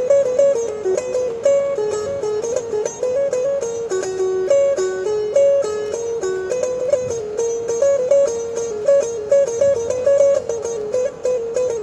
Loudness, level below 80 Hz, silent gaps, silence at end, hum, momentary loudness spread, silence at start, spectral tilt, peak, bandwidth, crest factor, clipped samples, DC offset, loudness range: -19 LUFS; -54 dBFS; none; 0 s; none; 7 LU; 0 s; -4 dB/octave; -4 dBFS; 11 kHz; 14 dB; under 0.1%; under 0.1%; 3 LU